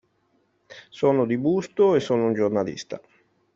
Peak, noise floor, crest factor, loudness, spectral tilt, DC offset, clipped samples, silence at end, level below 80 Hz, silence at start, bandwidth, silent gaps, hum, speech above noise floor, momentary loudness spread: -8 dBFS; -67 dBFS; 16 dB; -22 LUFS; -7 dB/octave; under 0.1%; under 0.1%; 0.6 s; -66 dBFS; 0.7 s; 7.6 kHz; none; none; 45 dB; 17 LU